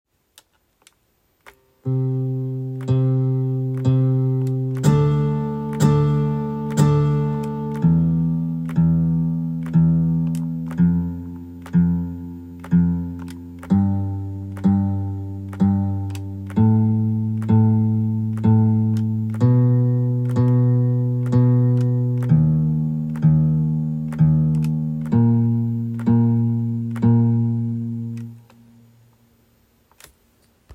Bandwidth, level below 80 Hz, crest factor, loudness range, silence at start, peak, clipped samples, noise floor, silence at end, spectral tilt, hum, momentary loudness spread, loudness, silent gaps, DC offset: 9.8 kHz; -46 dBFS; 16 dB; 4 LU; 1.85 s; -4 dBFS; under 0.1%; -64 dBFS; 0 s; -9.5 dB/octave; none; 10 LU; -20 LUFS; none; under 0.1%